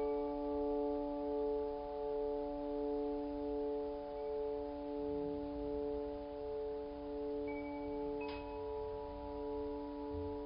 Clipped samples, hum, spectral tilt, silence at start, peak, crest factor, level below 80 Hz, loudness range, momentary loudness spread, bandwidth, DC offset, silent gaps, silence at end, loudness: under 0.1%; none; -6.5 dB/octave; 0 s; -28 dBFS; 12 dB; -56 dBFS; 4 LU; 6 LU; 5.2 kHz; under 0.1%; none; 0 s; -41 LUFS